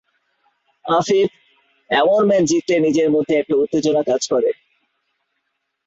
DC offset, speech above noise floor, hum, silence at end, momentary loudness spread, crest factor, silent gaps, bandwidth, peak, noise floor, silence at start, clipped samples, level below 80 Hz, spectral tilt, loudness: under 0.1%; 57 dB; none; 1.35 s; 6 LU; 16 dB; none; 8 kHz; -4 dBFS; -73 dBFS; 0.85 s; under 0.1%; -60 dBFS; -4.5 dB/octave; -17 LUFS